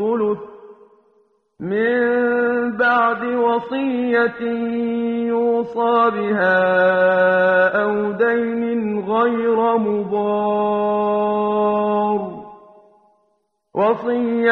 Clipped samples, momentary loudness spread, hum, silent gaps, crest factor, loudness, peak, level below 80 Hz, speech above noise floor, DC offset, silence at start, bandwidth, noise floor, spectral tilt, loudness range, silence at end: under 0.1%; 7 LU; none; none; 16 dB; -18 LUFS; -2 dBFS; -62 dBFS; 49 dB; under 0.1%; 0 s; 4.6 kHz; -67 dBFS; -8.5 dB/octave; 4 LU; 0 s